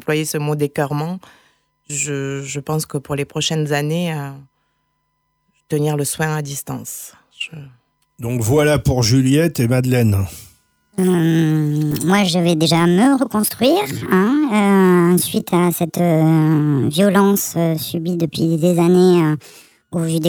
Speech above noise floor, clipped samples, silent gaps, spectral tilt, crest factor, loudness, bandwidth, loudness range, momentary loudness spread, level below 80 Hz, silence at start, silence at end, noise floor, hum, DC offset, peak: 52 dB; under 0.1%; none; -5.5 dB/octave; 14 dB; -17 LUFS; over 20 kHz; 9 LU; 13 LU; -46 dBFS; 0.05 s; 0 s; -69 dBFS; none; under 0.1%; -4 dBFS